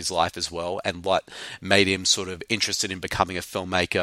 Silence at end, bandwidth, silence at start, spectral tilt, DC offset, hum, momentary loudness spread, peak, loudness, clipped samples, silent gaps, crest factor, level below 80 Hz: 0 s; 16.5 kHz; 0 s; -2.5 dB/octave; under 0.1%; none; 9 LU; 0 dBFS; -24 LUFS; under 0.1%; none; 24 dB; -52 dBFS